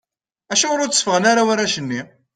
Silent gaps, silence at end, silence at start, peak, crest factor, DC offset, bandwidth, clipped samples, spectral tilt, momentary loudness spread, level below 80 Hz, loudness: none; 0.3 s; 0.5 s; 0 dBFS; 18 dB; under 0.1%; 10.5 kHz; under 0.1%; -2 dB/octave; 9 LU; -64 dBFS; -17 LUFS